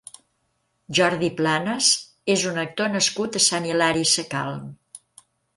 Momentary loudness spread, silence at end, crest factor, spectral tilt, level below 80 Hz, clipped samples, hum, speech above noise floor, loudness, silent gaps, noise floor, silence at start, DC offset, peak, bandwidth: 9 LU; 0.6 s; 20 dB; -2.5 dB/octave; -62 dBFS; under 0.1%; none; 49 dB; -21 LUFS; none; -71 dBFS; 0.9 s; under 0.1%; -4 dBFS; 11.5 kHz